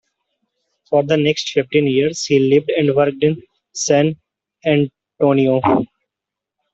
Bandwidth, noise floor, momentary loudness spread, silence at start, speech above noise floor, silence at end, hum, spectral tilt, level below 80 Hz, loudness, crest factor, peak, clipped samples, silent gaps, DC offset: 8 kHz; -84 dBFS; 10 LU; 0.9 s; 69 dB; 0.9 s; none; -5.5 dB/octave; -56 dBFS; -17 LUFS; 16 dB; -2 dBFS; under 0.1%; none; under 0.1%